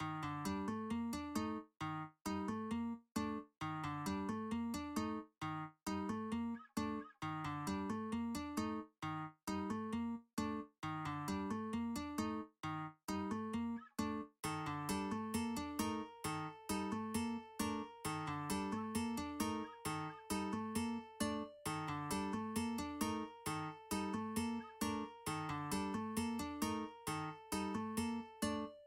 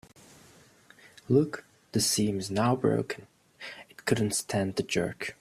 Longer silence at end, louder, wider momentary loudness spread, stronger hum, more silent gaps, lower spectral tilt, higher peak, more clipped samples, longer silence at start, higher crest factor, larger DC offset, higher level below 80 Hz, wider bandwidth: about the same, 0 s vs 0.1 s; second, -43 LUFS vs -28 LUFS; second, 4 LU vs 17 LU; neither; first, 13.04-13.08 s vs none; about the same, -5 dB/octave vs -4.5 dB/octave; second, -24 dBFS vs -10 dBFS; neither; second, 0 s vs 1.3 s; about the same, 18 dB vs 20 dB; neither; about the same, -66 dBFS vs -62 dBFS; about the same, 16.5 kHz vs 15.5 kHz